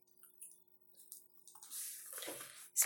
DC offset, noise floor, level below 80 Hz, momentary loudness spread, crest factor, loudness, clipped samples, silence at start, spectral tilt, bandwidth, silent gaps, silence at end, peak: under 0.1%; -65 dBFS; under -90 dBFS; 17 LU; 30 dB; -47 LUFS; under 0.1%; 0.2 s; 1.5 dB/octave; 17 kHz; none; 0 s; -16 dBFS